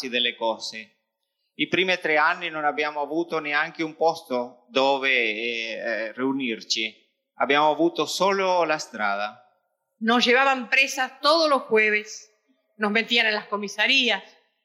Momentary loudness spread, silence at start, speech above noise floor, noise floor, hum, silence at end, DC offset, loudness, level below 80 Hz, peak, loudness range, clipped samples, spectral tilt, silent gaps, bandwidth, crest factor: 10 LU; 0 s; 54 dB; -78 dBFS; none; 0.4 s; under 0.1%; -23 LUFS; -80 dBFS; -6 dBFS; 3 LU; under 0.1%; -2.5 dB/octave; none; 16 kHz; 18 dB